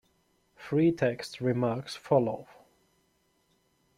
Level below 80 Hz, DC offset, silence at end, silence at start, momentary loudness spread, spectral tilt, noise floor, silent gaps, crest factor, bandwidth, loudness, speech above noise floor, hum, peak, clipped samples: -68 dBFS; under 0.1%; 1.55 s; 0.6 s; 11 LU; -7 dB/octave; -72 dBFS; none; 20 dB; 13.5 kHz; -29 LUFS; 43 dB; none; -10 dBFS; under 0.1%